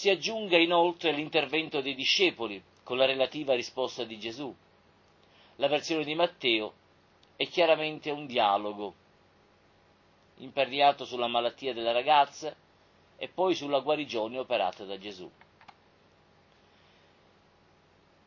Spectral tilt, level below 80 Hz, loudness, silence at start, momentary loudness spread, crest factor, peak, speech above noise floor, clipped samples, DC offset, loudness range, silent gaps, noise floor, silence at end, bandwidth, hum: -3.5 dB/octave; -74 dBFS; -28 LUFS; 0 s; 16 LU; 24 dB; -6 dBFS; 34 dB; under 0.1%; under 0.1%; 5 LU; none; -63 dBFS; 2.95 s; 7.4 kHz; none